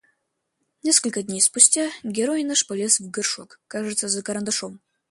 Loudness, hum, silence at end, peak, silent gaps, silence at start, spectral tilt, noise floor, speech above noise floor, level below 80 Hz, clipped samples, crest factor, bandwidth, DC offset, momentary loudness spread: -20 LUFS; none; 0.35 s; 0 dBFS; none; 0.85 s; -1.5 dB/octave; -76 dBFS; 53 dB; -70 dBFS; under 0.1%; 24 dB; 12 kHz; under 0.1%; 14 LU